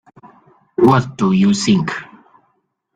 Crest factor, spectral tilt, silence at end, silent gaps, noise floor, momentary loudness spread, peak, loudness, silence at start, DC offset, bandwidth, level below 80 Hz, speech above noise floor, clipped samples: 16 dB; -6 dB/octave; 0.9 s; none; -66 dBFS; 13 LU; -2 dBFS; -15 LUFS; 0.8 s; under 0.1%; 9.2 kHz; -52 dBFS; 52 dB; under 0.1%